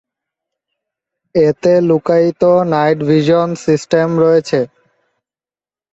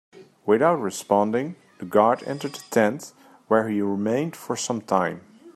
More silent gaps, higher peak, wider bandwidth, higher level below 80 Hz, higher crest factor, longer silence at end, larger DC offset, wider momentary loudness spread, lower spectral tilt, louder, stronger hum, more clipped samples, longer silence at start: neither; first, 0 dBFS vs -4 dBFS; second, 8 kHz vs 15 kHz; first, -54 dBFS vs -70 dBFS; second, 14 dB vs 20 dB; first, 1.25 s vs 0.05 s; neither; second, 6 LU vs 14 LU; first, -7 dB/octave vs -5 dB/octave; first, -13 LUFS vs -23 LUFS; neither; neither; first, 1.35 s vs 0.15 s